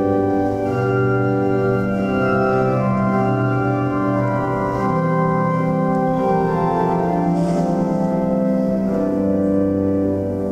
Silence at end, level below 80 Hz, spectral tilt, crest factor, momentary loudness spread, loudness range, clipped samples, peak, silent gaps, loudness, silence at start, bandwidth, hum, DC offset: 0 s; -42 dBFS; -9.5 dB/octave; 12 dB; 2 LU; 1 LU; under 0.1%; -6 dBFS; none; -19 LUFS; 0 s; 9.2 kHz; none; under 0.1%